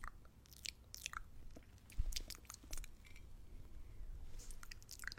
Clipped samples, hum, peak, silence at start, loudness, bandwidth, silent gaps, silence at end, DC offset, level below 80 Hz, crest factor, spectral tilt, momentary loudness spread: under 0.1%; none; -22 dBFS; 0 s; -53 LUFS; 16.5 kHz; none; 0 s; under 0.1%; -50 dBFS; 26 dB; -2 dB/octave; 14 LU